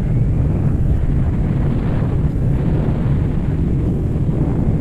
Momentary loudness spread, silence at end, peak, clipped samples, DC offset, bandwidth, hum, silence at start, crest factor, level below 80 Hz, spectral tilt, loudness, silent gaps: 1 LU; 0 s; -6 dBFS; under 0.1%; under 0.1%; 7.6 kHz; none; 0 s; 10 dB; -22 dBFS; -10.5 dB/octave; -18 LUFS; none